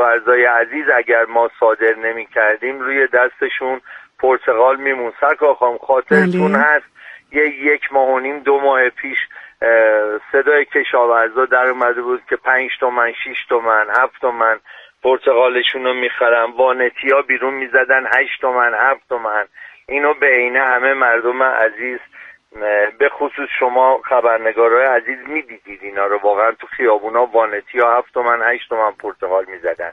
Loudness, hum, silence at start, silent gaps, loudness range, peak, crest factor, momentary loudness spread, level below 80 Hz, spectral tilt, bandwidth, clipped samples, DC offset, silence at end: -15 LUFS; none; 0 s; none; 2 LU; 0 dBFS; 16 dB; 8 LU; -62 dBFS; -6.5 dB/octave; 5.6 kHz; under 0.1%; under 0.1%; 0 s